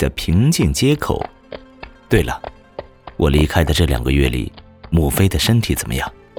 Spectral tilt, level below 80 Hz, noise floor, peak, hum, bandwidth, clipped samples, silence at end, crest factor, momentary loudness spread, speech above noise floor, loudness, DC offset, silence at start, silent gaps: -5.5 dB/octave; -26 dBFS; -39 dBFS; -2 dBFS; none; over 20 kHz; under 0.1%; 0.25 s; 16 dB; 20 LU; 24 dB; -17 LUFS; under 0.1%; 0 s; none